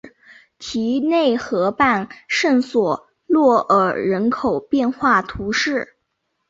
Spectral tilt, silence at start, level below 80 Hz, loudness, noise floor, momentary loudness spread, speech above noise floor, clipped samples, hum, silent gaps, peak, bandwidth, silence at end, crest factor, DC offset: -5 dB/octave; 0.05 s; -52 dBFS; -18 LUFS; -73 dBFS; 8 LU; 55 dB; under 0.1%; none; none; -4 dBFS; 7.8 kHz; 0.65 s; 16 dB; under 0.1%